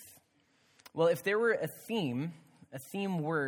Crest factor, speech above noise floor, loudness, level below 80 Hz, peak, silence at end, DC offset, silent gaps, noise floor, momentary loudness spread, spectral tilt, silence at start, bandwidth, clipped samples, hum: 18 dB; 38 dB; -33 LUFS; -80 dBFS; -16 dBFS; 0 s; under 0.1%; none; -71 dBFS; 15 LU; -6 dB/octave; 0 s; 19.5 kHz; under 0.1%; none